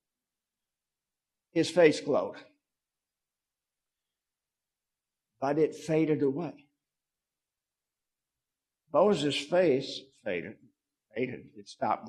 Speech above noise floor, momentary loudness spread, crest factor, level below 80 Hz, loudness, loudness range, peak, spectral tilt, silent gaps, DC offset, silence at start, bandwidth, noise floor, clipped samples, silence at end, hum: over 62 dB; 16 LU; 24 dB; -76 dBFS; -29 LUFS; 5 LU; -8 dBFS; -5.5 dB/octave; none; under 0.1%; 1.55 s; 12 kHz; under -90 dBFS; under 0.1%; 0 s; none